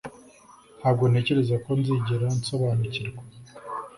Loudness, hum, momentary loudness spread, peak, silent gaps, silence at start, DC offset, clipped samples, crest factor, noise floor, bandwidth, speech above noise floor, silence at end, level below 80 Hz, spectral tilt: -25 LUFS; none; 21 LU; -10 dBFS; none; 0.05 s; under 0.1%; under 0.1%; 16 dB; -52 dBFS; 11.5 kHz; 28 dB; 0 s; -56 dBFS; -7 dB/octave